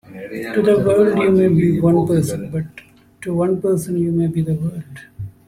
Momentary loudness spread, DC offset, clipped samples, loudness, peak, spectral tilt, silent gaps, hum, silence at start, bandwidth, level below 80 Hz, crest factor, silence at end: 18 LU; under 0.1%; under 0.1%; -17 LUFS; -2 dBFS; -8 dB/octave; none; none; 0.1 s; 15 kHz; -48 dBFS; 14 dB; 0.15 s